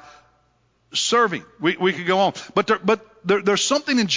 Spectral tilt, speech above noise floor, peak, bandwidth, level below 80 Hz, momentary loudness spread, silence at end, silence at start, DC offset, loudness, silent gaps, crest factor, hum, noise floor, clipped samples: -3.5 dB/octave; 43 dB; -4 dBFS; 7.6 kHz; -66 dBFS; 5 LU; 0 s; 0.95 s; under 0.1%; -20 LUFS; none; 18 dB; none; -63 dBFS; under 0.1%